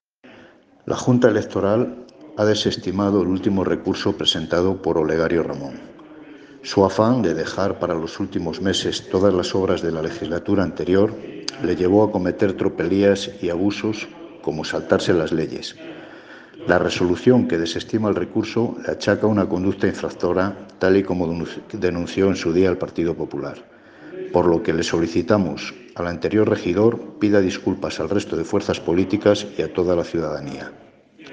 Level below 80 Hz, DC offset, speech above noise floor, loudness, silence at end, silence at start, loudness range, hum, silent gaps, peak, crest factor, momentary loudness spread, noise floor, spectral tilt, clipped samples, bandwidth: -54 dBFS; under 0.1%; 29 dB; -21 LUFS; 0 s; 0.25 s; 2 LU; none; none; 0 dBFS; 20 dB; 12 LU; -49 dBFS; -6 dB/octave; under 0.1%; 9.6 kHz